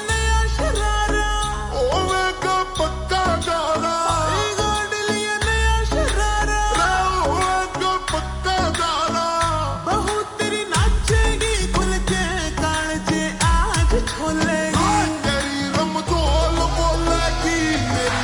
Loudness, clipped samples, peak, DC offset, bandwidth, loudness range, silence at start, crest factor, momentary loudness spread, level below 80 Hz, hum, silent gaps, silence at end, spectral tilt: -20 LUFS; under 0.1%; -4 dBFS; under 0.1%; 18.5 kHz; 1 LU; 0 s; 14 dB; 3 LU; -26 dBFS; none; none; 0 s; -4 dB/octave